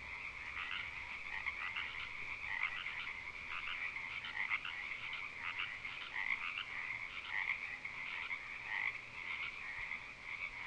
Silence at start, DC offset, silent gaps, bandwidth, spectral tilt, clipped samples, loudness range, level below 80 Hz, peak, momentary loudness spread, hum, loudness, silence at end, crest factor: 0 s; under 0.1%; none; 11 kHz; -2 dB/octave; under 0.1%; 1 LU; -66 dBFS; -24 dBFS; 6 LU; none; -41 LUFS; 0 s; 20 dB